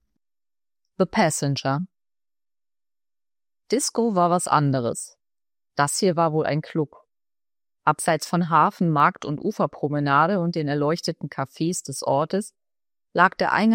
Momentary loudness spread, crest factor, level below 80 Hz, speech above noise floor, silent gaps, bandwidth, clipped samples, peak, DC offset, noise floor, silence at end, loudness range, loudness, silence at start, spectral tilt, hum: 10 LU; 20 dB; -66 dBFS; over 68 dB; none; 16 kHz; under 0.1%; -2 dBFS; under 0.1%; under -90 dBFS; 0 s; 5 LU; -23 LUFS; 1 s; -5 dB/octave; none